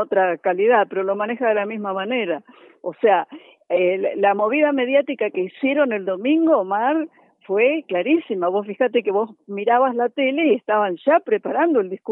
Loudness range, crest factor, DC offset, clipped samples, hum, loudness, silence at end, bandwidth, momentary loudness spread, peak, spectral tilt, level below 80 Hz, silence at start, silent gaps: 2 LU; 14 dB; under 0.1%; under 0.1%; none; -20 LUFS; 0 s; 4 kHz; 7 LU; -4 dBFS; -9 dB/octave; -84 dBFS; 0 s; none